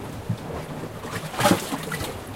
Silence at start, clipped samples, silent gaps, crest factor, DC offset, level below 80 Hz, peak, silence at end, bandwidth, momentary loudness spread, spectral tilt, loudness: 0 s; under 0.1%; none; 24 dB; under 0.1%; -48 dBFS; -4 dBFS; 0 s; 17 kHz; 12 LU; -4.5 dB/octave; -27 LUFS